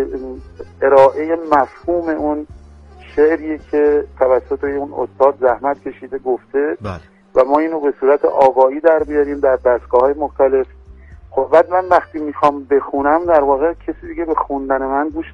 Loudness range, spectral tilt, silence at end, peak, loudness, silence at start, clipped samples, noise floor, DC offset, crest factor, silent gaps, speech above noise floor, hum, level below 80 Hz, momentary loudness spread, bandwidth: 3 LU; -7.5 dB/octave; 0 s; 0 dBFS; -16 LUFS; 0 s; under 0.1%; -40 dBFS; under 0.1%; 16 dB; none; 25 dB; none; -42 dBFS; 12 LU; 6.6 kHz